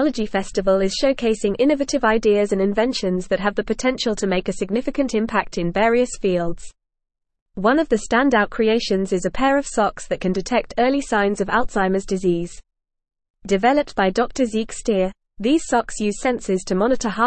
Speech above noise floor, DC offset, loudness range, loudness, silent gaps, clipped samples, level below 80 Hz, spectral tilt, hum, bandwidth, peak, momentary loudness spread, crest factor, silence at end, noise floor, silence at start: 59 dB; 0.4%; 2 LU; -20 LUFS; 7.41-7.46 s, 13.30-13.34 s; under 0.1%; -40 dBFS; -5 dB/octave; none; 8.8 kHz; -4 dBFS; 6 LU; 16 dB; 0 s; -78 dBFS; 0 s